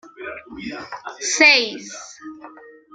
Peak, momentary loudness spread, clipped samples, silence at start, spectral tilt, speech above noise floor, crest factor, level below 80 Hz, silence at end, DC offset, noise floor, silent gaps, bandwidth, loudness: -2 dBFS; 25 LU; under 0.1%; 0.05 s; 0 dB/octave; 24 dB; 22 dB; -62 dBFS; 0.25 s; under 0.1%; -43 dBFS; none; 12 kHz; -15 LUFS